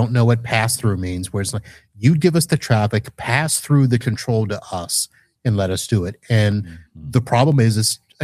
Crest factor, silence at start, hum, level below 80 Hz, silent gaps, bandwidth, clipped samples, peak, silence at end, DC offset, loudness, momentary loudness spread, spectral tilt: 16 dB; 0 s; none; -48 dBFS; none; 15.5 kHz; under 0.1%; -2 dBFS; 0 s; under 0.1%; -19 LUFS; 9 LU; -5 dB/octave